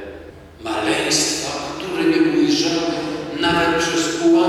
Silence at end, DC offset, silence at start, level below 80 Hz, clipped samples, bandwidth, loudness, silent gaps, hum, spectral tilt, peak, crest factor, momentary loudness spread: 0 s; under 0.1%; 0 s; -48 dBFS; under 0.1%; 14 kHz; -19 LUFS; none; none; -3 dB/octave; -4 dBFS; 14 dB; 10 LU